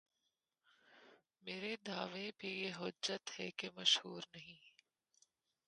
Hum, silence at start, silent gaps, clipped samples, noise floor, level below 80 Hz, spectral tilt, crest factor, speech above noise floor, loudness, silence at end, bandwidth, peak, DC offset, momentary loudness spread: none; 0.9 s; none; under 0.1%; -88 dBFS; -88 dBFS; -2 dB/octave; 28 dB; 45 dB; -41 LUFS; 1 s; 11 kHz; -18 dBFS; under 0.1%; 19 LU